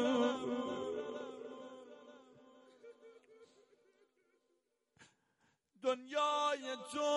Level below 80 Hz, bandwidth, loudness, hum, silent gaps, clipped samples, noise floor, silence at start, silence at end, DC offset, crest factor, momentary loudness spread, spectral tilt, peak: -84 dBFS; 11.5 kHz; -38 LUFS; none; none; under 0.1%; -82 dBFS; 0 s; 0 s; under 0.1%; 18 dB; 25 LU; -3.5 dB/octave; -22 dBFS